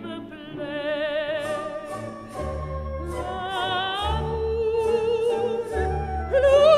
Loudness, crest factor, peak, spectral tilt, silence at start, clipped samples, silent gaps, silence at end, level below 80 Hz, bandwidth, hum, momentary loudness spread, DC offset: -26 LUFS; 18 dB; -6 dBFS; -5.5 dB/octave; 0 s; under 0.1%; none; 0 s; -36 dBFS; 13 kHz; none; 11 LU; under 0.1%